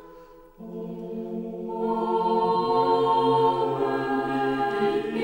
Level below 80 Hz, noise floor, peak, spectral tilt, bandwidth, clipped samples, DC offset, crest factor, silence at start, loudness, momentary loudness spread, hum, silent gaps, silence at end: -58 dBFS; -48 dBFS; -10 dBFS; -7 dB/octave; 16.5 kHz; under 0.1%; under 0.1%; 14 dB; 0 s; -24 LUFS; 14 LU; none; none; 0 s